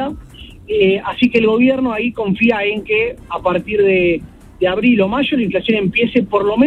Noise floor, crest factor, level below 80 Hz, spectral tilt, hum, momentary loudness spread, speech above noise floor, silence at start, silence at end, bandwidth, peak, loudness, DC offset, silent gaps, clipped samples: -36 dBFS; 14 dB; -42 dBFS; -7.5 dB/octave; none; 7 LU; 21 dB; 0 s; 0 s; 5.6 kHz; 0 dBFS; -15 LUFS; under 0.1%; none; under 0.1%